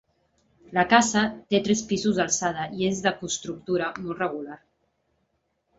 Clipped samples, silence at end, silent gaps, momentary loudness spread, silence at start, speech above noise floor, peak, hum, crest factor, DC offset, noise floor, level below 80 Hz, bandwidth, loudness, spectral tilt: under 0.1%; 1.25 s; none; 11 LU; 0.7 s; 49 dB; -4 dBFS; none; 24 dB; under 0.1%; -74 dBFS; -58 dBFS; 8 kHz; -25 LUFS; -3.5 dB/octave